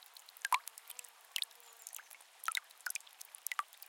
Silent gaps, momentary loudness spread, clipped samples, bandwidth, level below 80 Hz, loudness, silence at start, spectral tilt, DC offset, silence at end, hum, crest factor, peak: none; 15 LU; under 0.1%; 17 kHz; under -90 dBFS; -42 LUFS; 0 s; 6.5 dB/octave; under 0.1%; 0.05 s; none; 32 dB; -12 dBFS